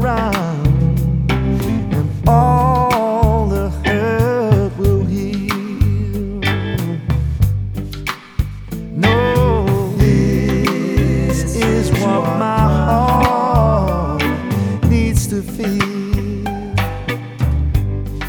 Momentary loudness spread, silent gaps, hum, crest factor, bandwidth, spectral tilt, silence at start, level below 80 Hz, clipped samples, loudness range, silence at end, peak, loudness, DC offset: 8 LU; none; none; 14 dB; over 20 kHz; -7 dB/octave; 0 s; -24 dBFS; under 0.1%; 4 LU; 0 s; 0 dBFS; -16 LUFS; 0.1%